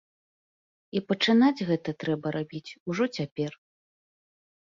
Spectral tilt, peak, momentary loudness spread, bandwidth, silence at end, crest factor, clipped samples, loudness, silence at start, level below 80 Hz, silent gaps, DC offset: -6 dB/octave; -10 dBFS; 13 LU; 7.4 kHz; 1.25 s; 20 dB; under 0.1%; -28 LUFS; 0.95 s; -72 dBFS; 2.80-2.86 s, 3.32-3.36 s; under 0.1%